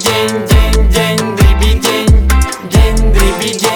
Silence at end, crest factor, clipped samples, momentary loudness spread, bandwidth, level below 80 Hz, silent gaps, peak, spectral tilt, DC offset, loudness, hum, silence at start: 0 s; 8 dB; under 0.1%; 4 LU; over 20 kHz; -12 dBFS; none; 0 dBFS; -4.5 dB/octave; under 0.1%; -11 LUFS; none; 0 s